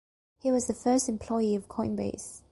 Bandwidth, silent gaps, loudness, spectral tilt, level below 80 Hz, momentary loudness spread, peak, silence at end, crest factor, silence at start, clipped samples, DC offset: 11.5 kHz; none; -29 LUFS; -5 dB/octave; -56 dBFS; 8 LU; -14 dBFS; 0.15 s; 16 dB; 0.45 s; under 0.1%; under 0.1%